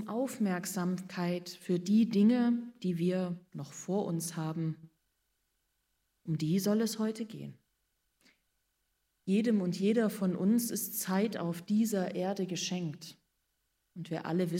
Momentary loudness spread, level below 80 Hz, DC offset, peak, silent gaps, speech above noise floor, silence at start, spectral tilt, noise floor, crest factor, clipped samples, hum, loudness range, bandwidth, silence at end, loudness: 14 LU; -80 dBFS; under 0.1%; -18 dBFS; none; 48 dB; 0 s; -6 dB/octave; -80 dBFS; 16 dB; under 0.1%; none; 5 LU; 16 kHz; 0 s; -32 LUFS